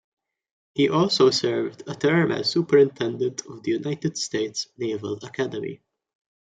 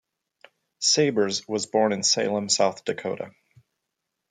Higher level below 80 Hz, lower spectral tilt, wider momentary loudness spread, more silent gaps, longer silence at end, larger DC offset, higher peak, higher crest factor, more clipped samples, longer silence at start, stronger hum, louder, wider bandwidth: first, -68 dBFS vs -74 dBFS; first, -5 dB/octave vs -2.5 dB/octave; about the same, 13 LU vs 11 LU; neither; second, 0.75 s vs 1 s; neither; about the same, -6 dBFS vs -6 dBFS; about the same, 18 dB vs 20 dB; neither; about the same, 0.75 s vs 0.8 s; neither; about the same, -23 LUFS vs -23 LUFS; second, 9.4 kHz vs 11 kHz